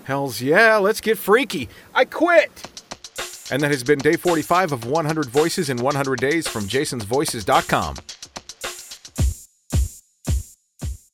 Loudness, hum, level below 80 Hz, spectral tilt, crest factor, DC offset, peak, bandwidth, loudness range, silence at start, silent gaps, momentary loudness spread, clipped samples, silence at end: -20 LUFS; none; -34 dBFS; -4.5 dB/octave; 20 dB; under 0.1%; 0 dBFS; 18 kHz; 6 LU; 0.05 s; none; 18 LU; under 0.1%; 0.2 s